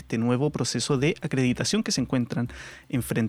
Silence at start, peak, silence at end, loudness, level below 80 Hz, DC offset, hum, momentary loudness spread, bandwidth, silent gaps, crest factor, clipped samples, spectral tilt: 0 s; -10 dBFS; 0 s; -26 LUFS; -52 dBFS; under 0.1%; none; 7 LU; 15.5 kHz; none; 16 dB; under 0.1%; -5 dB/octave